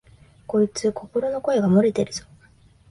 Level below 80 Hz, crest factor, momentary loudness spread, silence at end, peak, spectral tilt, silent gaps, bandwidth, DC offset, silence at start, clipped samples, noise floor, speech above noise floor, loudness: -56 dBFS; 16 dB; 9 LU; 0.7 s; -8 dBFS; -6.5 dB/octave; none; 11.5 kHz; under 0.1%; 0.5 s; under 0.1%; -54 dBFS; 33 dB; -22 LUFS